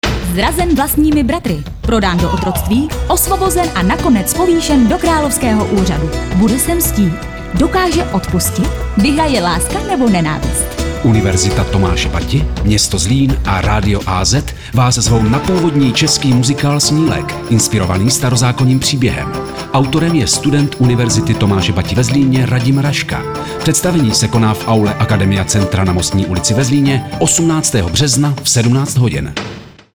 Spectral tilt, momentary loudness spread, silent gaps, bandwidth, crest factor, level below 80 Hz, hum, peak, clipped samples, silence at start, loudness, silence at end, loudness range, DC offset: -4.5 dB/octave; 5 LU; none; over 20 kHz; 10 dB; -24 dBFS; none; -2 dBFS; under 0.1%; 0.05 s; -13 LUFS; 0.25 s; 2 LU; under 0.1%